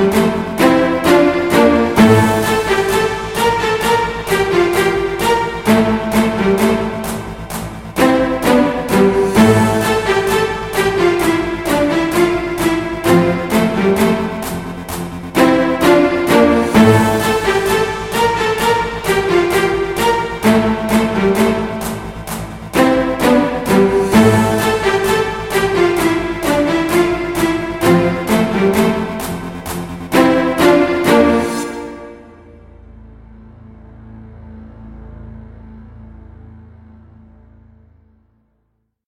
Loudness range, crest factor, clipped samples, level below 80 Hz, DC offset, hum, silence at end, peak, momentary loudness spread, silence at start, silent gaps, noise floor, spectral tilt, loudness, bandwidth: 3 LU; 14 dB; under 0.1%; -36 dBFS; 0.2%; none; 2.4 s; 0 dBFS; 12 LU; 0 s; none; -66 dBFS; -5.5 dB/octave; -14 LUFS; 16.5 kHz